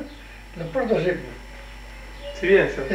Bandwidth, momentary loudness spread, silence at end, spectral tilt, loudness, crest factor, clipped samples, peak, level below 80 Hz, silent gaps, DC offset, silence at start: 11.5 kHz; 22 LU; 0 s; -6.5 dB/octave; -22 LUFS; 20 dB; under 0.1%; -6 dBFS; -42 dBFS; none; under 0.1%; 0 s